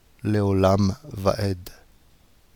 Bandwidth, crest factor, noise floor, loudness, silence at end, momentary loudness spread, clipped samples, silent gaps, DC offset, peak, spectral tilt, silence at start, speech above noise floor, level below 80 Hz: 18 kHz; 18 dB; -57 dBFS; -23 LUFS; 0.85 s; 11 LU; under 0.1%; none; under 0.1%; -6 dBFS; -7 dB/octave; 0.25 s; 35 dB; -48 dBFS